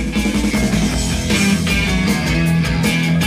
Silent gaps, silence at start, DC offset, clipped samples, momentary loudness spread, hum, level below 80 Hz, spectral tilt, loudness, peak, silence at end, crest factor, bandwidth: none; 0 s; under 0.1%; under 0.1%; 3 LU; none; -26 dBFS; -4.5 dB/octave; -16 LUFS; -4 dBFS; 0 s; 12 dB; 15.5 kHz